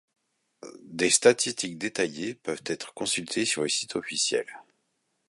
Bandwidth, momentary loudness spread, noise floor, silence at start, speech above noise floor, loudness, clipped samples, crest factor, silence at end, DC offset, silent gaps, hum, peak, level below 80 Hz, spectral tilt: 11.5 kHz; 14 LU; -76 dBFS; 0.65 s; 49 dB; -26 LUFS; under 0.1%; 24 dB; 0.65 s; under 0.1%; none; none; -4 dBFS; -72 dBFS; -2 dB/octave